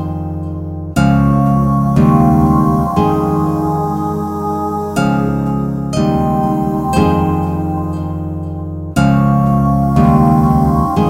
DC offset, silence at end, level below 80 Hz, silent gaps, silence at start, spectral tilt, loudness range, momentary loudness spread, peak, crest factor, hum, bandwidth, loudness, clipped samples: under 0.1%; 0 s; -28 dBFS; none; 0 s; -8.5 dB/octave; 4 LU; 11 LU; 0 dBFS; 14 dB; none; 15.5 kHz; -14 LUFS; under 0.1%